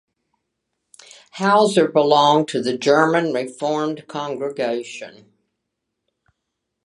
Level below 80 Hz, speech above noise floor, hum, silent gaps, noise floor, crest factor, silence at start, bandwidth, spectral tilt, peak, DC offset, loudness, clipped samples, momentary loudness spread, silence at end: -74 dBFS; 60 dB; none; none; -78 dBFS; 20 dB; 1.35 s; 11.5 kHz; -5 dB/octave; 0 dBFS; under 0.1%; -18 LUFS; under 0.1%; 13 LU; 1.75 s